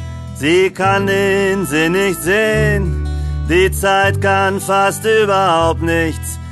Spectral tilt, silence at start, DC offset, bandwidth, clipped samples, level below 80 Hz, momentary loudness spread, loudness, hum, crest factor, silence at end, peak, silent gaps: -5 dB/octave; 0 s; under 0.1%; 13 kHz; under 0.1%; -26 dBFS; 7 LU; -14 LUFS; none; 12 dB; 0 s; -2 dBFS; none